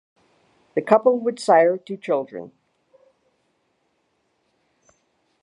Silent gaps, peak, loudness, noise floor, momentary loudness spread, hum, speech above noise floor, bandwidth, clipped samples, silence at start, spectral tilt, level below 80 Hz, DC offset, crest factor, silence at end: none; 0 dBFS; -20 LUFS; -70 dBFS; 18 LU; none; 50 dB; 11.5 kHz; under 0.1%; 0.75 s; -5.5 dB/octave; -76 dBFS; under 0.1%; 24 dB; 2.95 s